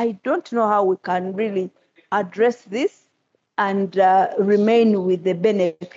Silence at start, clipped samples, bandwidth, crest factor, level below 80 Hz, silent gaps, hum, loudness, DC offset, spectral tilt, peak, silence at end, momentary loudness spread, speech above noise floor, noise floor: 0 s; under 0.1%; 7.8 kHz; 14 dB; -80 dBFS; none; none; -20 LUFS; under 0.1%; -7 dB/octave; -6 dBFS; 0.1 s; 9 LU; 50 dB; -69 dBFS